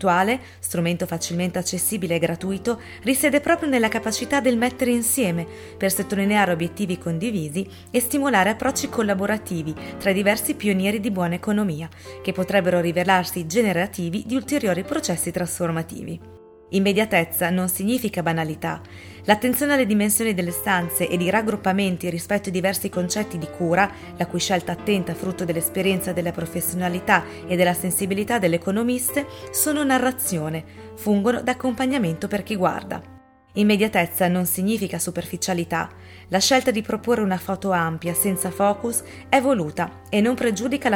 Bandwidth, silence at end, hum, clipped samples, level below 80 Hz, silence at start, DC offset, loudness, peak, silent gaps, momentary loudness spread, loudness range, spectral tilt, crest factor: 19 kHz; 0 s; none; under 0.1%; -54 dBFS; 0 s; under 0.1%; -22 LUFS; 0 dBFS; none; 8 LU; 2 LU; -4.5 dB/octave; 22 dB